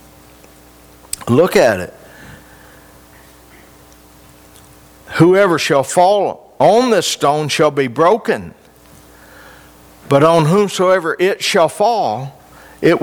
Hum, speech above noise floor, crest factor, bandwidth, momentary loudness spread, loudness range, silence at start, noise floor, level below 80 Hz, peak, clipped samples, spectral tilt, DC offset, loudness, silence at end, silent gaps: none; 31 dB; 16 dB; over 20 kHz; 12 LU; 6 LU; 1.2 s; -44 dBFS; -52 dBFS; 0 dBFS; under 0.1%; -5 dB/octave; under 0.1%; -14 LUFS; 0 s; none